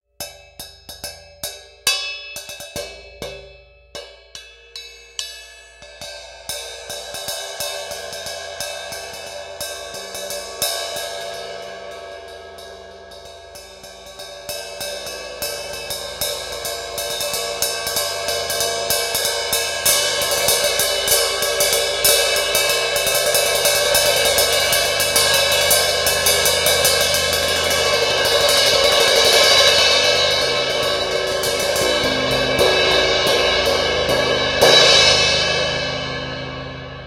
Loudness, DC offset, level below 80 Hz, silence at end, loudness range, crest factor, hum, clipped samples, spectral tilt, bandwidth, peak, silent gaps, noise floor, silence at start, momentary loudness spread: -16 LUFS; under 0.1%; -46 dBFS; 0 s; 18 LU; 20 dB; none; under 0.1%; -1 dB/octave; 17 kHz; 0 dBFS; none; -45 dBFS; 0.2 s; 21 LU